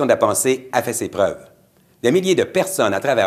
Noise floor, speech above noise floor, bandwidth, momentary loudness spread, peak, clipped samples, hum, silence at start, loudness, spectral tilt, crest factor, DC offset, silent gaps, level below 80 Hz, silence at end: -54 dBFS; 36 dB; 15 kHz; 6 LU; 0 dBFS; under 0.1%; none; 0 s; -19 LUFS; -4 dB/octave; 18 dB; under 0.1%; none; -62 dBFS; 0 s